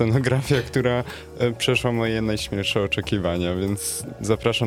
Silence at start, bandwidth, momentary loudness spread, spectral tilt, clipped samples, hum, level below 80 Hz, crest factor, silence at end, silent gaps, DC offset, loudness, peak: 0 s; 16 kHz; 5 LU; -5 dB/octave; under 0.1%; none; -44 dBFS; 18 dB; 0 s; none; under 0.1%; -23 LUFS; -4 dBFS